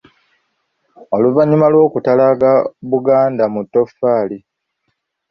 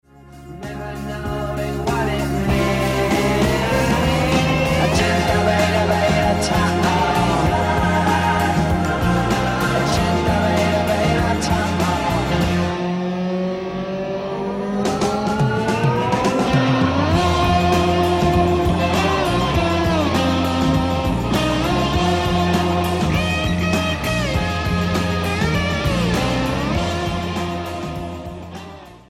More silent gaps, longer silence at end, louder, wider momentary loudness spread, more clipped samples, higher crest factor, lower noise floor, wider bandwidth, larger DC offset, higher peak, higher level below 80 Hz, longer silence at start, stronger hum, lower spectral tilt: neither; first, 0.9 s vs 0.1 s; first, -14 LUFS vs -19 LUFS; about the same, 7 LU vs 8 LU; neither; about the same, 14 dB vs 14 dB; first, -70 dBFS vs -39 dBFS; second, 6 kHz vs 16 kHz; neither; first, 0 dBFS vs -4 dBFS; second, -58 dBFS vs -32 dBFS; first, 1.1 s vs 0.25 s; neither; first, -10.5 dB/octave vs -5.5 dB/octave